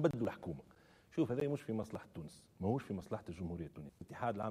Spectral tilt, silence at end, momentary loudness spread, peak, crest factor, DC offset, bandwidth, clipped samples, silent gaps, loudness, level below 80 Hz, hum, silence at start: -8 dB/octave; 0 s; 15 LU; -18 dBFS; 22 dB; under 0.1%; 15 kHz; under 0.1%; none; -42 LUFS; -66 dBFS; none; 0 s